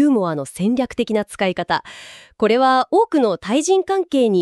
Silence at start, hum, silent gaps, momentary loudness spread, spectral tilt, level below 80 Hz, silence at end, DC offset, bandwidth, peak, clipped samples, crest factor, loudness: 0 s; none; none; 8 LU; -5 dB/octave; -56 dBFS; 0 s; under 0.1%; 12.5 kHz; -4 dBFS; under 0.1%; 14 dB; -18 LUFS